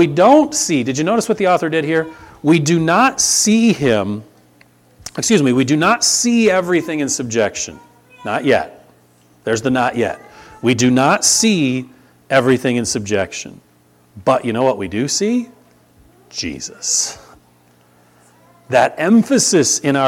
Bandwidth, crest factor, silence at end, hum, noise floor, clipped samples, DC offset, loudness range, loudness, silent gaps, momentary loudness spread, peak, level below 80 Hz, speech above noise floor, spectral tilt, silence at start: 16.5 kHz; 16 dB; 0 s; 60 Hz at -45 dBFS; -52 dBFS; under 0.1%; under 0.1%; 6 LU; -15 LUFS; none; 13 LU; 0 dBFS; -54 dBFS; 37 dB; -3.5 dB/octave; 0 s